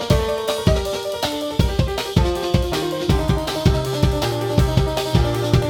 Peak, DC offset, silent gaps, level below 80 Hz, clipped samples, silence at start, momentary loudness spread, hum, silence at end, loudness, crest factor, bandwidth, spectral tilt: -2 dBFS; under 0.1%; none; -26 dBFS; under 0.1%; 0 s; 3 LU; none; 0 s; -20 LUFS; 18 dB; 18 kHz; -6 dB/octave